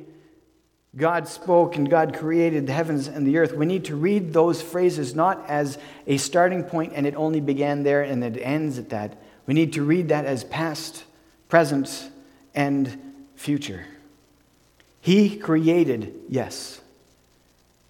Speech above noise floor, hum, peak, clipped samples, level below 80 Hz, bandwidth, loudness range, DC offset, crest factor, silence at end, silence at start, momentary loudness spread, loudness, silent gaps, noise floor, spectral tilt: 41 dB; none; -2 dBFS; under 0.1%; -64 dBFS; 17 kHz; 4 LU; under 0.1%; 22 dB; 1.1 s; 0 s; 13 LU; -23 LUFS; none; -63 dBFS; -6 dB/octave